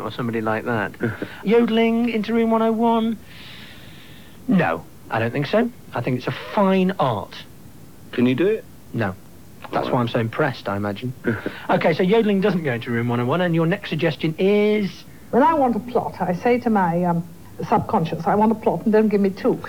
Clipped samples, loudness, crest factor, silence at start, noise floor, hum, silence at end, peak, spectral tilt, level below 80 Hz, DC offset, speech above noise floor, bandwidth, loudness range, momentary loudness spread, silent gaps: under 0.1%; -21 LUFS; 14 dB; 0 s; -44 dBFS; none; 0 s; -6 dBFS; -7.5 dB/octave; -56 dBFS; 0.6%; 24 dB; 19 kHz; 4 LU; 11 LU; none